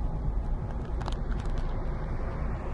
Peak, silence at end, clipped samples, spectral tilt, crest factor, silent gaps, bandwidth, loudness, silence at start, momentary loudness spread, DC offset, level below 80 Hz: -16 dBFS; 0 s; under 0.1%; -8 dB/octave; 14 dB; none; 7.6 kHz; -35 LUFS; 0 s; 2 LU; under 0.1%; -32 dBFS